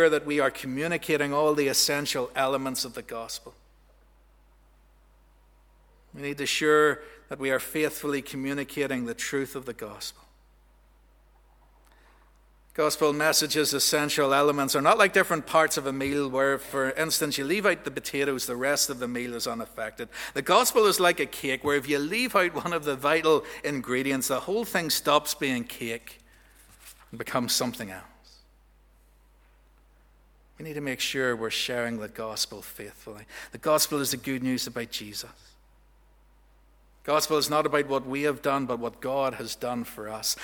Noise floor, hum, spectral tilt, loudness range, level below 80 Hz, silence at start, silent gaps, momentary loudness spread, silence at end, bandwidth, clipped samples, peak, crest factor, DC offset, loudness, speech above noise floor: -59 dBFS; none; -3 dB/octave; 11 LU; -60 dBFS; 0 s; none; 15 LU; 0 s; over 20 kHz; under 0.1%; -4 dBFS; 24 dB; under 0.1%; -26 LUFS; 32 dB